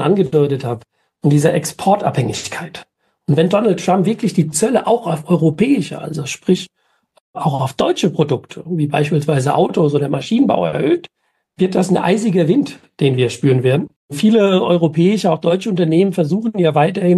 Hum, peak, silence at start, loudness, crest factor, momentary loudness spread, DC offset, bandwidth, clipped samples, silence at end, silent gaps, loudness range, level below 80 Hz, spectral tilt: none; 0 dBFS; 0 s; -16 LUFS; 14 dB; 9 LU; under 0.1%; 12.5 kHz; under 0.1%; 0 s; 7.20-7.34 s, 13.96-14.09 s; 3 LU; -56 dBFS; -6.5 dB/octave